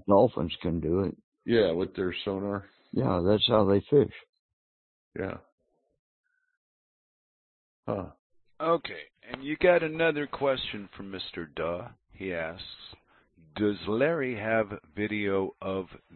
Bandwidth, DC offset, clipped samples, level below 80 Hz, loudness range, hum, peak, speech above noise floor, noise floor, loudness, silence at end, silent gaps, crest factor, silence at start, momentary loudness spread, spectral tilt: 4.5 kHz; under 0.1%; under 0.1%; -56 dBFS; 15 LU; none; -8 dBFS; 33 dB; -61 dBFS; -29 LUFS; 0.2 s; 1.24-1.32 s, 4.29-4.33 s, 4.39-5.12 s, 5.52-5.58 s, 5.99-6.24 s, 6.57-7.83 s, 8.19-8.30 s; 22 dB; 0.05 s; 18 LU; -10 dB/octave